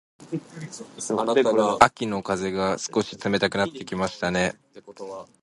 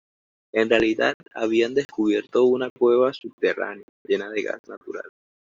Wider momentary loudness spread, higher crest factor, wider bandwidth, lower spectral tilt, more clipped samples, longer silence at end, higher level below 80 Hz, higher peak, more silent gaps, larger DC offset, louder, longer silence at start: first, 19 LU vs 16 LU; first, 24 dB vs 18 dB; first, 11.5 kHz vs 7.6 kHz; about the same, -4.5 dB/octave vs -5 dB/octave; neither; second, 0.15 s vs 0.4 s; about the same, -56 dBFS vs -60 dBFS; first, 0 dBFS vs -4 dBFS; second, none vs 1.14-1.20 s, 1.85-1.89 s, 2.70-2.76 s, 3.33-3.38 s, 3.83-4.05 s, 4.59-4.64 s, 4.77-4.81 s; neither; about the same, -24 LUFS vs -23 LUFS; second, 0.2 s vs 0.55 s